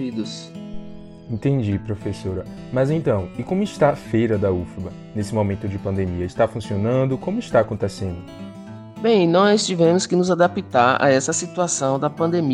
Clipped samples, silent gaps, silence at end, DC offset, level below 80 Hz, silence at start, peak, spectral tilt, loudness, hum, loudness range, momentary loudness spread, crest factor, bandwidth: under 0.1%; none; 0 s; under 0.1%; -48 dBFS; 0 s; -2 dBFS; -5.5 dB/octave; -20 LUFS; none; 6 LU; 17 LU; 18 dB; 12 kHz